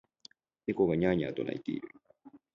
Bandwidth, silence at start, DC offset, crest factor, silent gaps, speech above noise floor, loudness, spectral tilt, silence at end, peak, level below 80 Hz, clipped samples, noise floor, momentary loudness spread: 7.4 kHz; 0.65 s; under 0.1%; 20 dB; none; 29 dB; -32 LUFS; -8.5 dB/octave; 0.2 s; -14 dBFS; -60 dBFS; under 0.1%; -60 dBFS; 13 LU